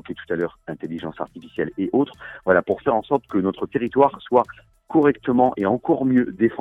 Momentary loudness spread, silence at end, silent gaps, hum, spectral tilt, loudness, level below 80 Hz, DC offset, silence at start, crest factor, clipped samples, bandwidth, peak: 12 LU; 0 s; none; none; -9 dB/octave; -22 LUFS; -56 dBFS; under 0.1%; 0.1 s; 18 dB; under 0.1%; 4 kHz; -4 dBFS